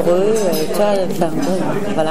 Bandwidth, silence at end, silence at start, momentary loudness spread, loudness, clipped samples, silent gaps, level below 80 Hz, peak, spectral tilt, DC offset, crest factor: 16 kHz; 0 s; 0 s; 4 LU; -17 LUFS; under 0.1%; none; -46 dBFS; -2 dBFS; -5.5 dB/octave; 8%; 14 dB